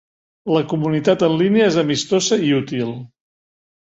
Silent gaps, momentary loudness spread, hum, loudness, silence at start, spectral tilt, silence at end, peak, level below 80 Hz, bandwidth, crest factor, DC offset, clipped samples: none; 10 LU; none; -18 LUFS; 0.45 s; -5 dB/octave; 0.9 s; -2 dBFS; -58 dBFS; 8.2 kHz; 16 dB; under 0.1%; under 0.1%